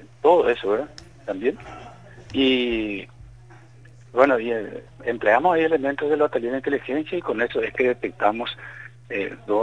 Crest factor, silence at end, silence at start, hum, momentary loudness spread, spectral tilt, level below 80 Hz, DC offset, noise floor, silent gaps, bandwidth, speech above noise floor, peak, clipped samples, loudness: 20 dB; 0 s; 0 s; none; 18 LU; -6 dB/octave; -54 dBFS; 0.2%; -48 dBFS; none; 9.6 kHz; 25 dB; -2 dBFS; under 0.1%; -22 LUFS